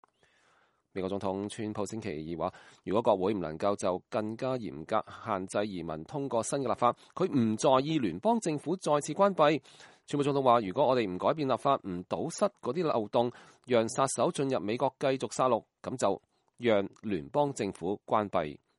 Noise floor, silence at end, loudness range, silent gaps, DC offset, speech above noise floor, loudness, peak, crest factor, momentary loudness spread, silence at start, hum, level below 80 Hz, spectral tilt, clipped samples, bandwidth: -69 dBFS; 0.2 s; 4 LU; none; under 0.1%; 39 dB; -31 LUFS; -10 dBFS; 20 dB; 10 LU; 0.95 s; none; -68 dBFS; -5.5 dB/octave; under 0.1%; 11.5 kHz